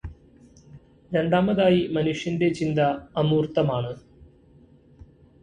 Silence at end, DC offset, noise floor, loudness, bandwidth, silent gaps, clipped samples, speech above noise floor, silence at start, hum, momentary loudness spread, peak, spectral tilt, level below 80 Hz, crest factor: 1.2 s; under 0.1%; -54 dBFS; -23 LUFS; 9.8 kHz; none; under 0.1%; 32 dB; 0.05 s; none; 9 LU; -8 dBFS; -7.5 dB/octave; -52 dBFS; 18 dB